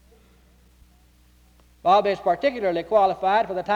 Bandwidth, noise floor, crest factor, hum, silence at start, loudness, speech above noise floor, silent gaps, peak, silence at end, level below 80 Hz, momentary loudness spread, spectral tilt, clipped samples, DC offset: 11.5 kHz; -56 dBFS; 16 dB; none; 1.85 s; -21 LUFS; 35 dB; none; -8 dBFS; 0 s; -56 dBFS; 4 LU; -6 dB/octave; under 0.1%; under 0.1%